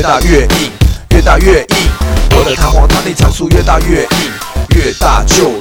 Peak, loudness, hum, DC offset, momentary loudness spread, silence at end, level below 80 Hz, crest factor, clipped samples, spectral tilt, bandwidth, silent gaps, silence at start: 0 dBFS; -10 LUFS; none; under 0.1%; 5 LU; 0 s; -12 dBFS; 8 dB; 1%; -4.5 dB/octave; 18 kHz; none; 0 s